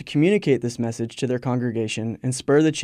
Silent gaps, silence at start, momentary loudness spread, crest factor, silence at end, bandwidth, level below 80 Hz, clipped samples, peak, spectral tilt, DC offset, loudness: none; 0 s; 8 LU; 16 dB; 0 s; 13 kHz; -60 dBFS; under 0.1%; -6 dBFS; -6 dB/octave; under 0.1%; -23 LUFS